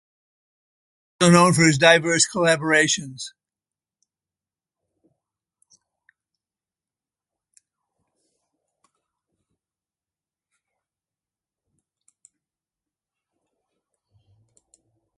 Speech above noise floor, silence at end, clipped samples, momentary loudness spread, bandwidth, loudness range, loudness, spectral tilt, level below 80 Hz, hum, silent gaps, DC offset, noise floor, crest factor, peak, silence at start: over 72 dB; 11.9 s; under 0.1%; 18 LU; 11.5 kHz; 15 LU; -17 LUFS; -4 dB/octave; -66 dBFS; none; none; under 0.1%; under -90 dBFS; 24 dB; -2 dBFS; 1.2 s